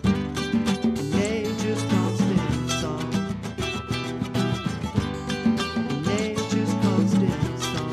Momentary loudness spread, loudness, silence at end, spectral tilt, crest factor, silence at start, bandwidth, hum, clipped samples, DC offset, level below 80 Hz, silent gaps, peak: 6 LU; -25 LUFS; 0 s; -5.5 dB/octave; 16 dB; 0 s; 14 kHz; none; under 0.1%; under 0.1%; -44 dBFS; none; -8 dBFS